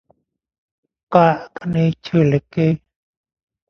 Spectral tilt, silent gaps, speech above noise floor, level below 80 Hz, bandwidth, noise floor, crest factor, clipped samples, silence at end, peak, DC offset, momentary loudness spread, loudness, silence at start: -9 dB/octave; none; 46 dB; -52 dBFS; 6.6 kHz; -62 dBFS; 20 dB; under 0.1%; 0.95 s; 0 dBFS; under 0.1%; 9 LU; -18 LUFS; 1.1 s